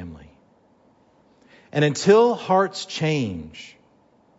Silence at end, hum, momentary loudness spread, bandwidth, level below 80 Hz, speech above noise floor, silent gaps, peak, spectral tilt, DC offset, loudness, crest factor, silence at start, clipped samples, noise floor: 0.7 s; none; 22 LU; 8 kHz; -58 dBFS; 38 dB; none; -2 dBFS; -5.5 dB/octave; under 0.1%; -20 LUFS; 20 dB; 0 s; under 0.1%; -58 dBFS